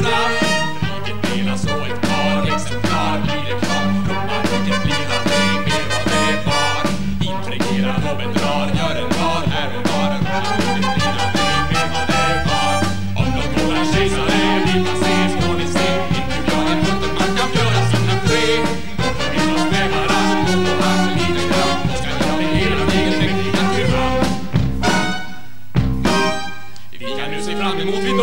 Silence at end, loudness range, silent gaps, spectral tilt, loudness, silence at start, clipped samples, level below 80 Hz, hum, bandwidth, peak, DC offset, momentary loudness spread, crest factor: 0 s; 2 LU; none; -5 dB/octave; -18 LUFS; 0 s; under 0.1%; -34 dBFS; none; 16.5 kHz; -2 dBFS; 8%; 5 LU; 16 dB